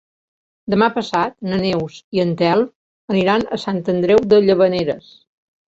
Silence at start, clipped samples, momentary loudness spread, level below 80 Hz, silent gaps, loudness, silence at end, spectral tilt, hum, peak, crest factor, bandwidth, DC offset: 0.65 s; under 0.1%; 11 LU; -52 dBFS; 2.04-2.12 s, 2.75-3.08 s; -17 LUFS; 0.7 s; -7 dB/octave; none; 0 dBFS; 16 dB; 7.8 kHz; under 0.1%